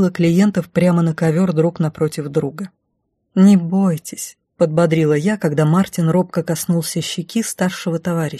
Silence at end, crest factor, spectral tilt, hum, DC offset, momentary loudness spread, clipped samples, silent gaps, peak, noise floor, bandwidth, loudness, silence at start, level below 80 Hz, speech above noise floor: 0 s; 16 dB; -6.5 dB/octave; none; under 0.1%; 9 LU; under 0.1%; none; -2 dBFS; -70 dBFS; 13 kHz; -17 LUFS; 0 s; -56 dBFS; 54 dB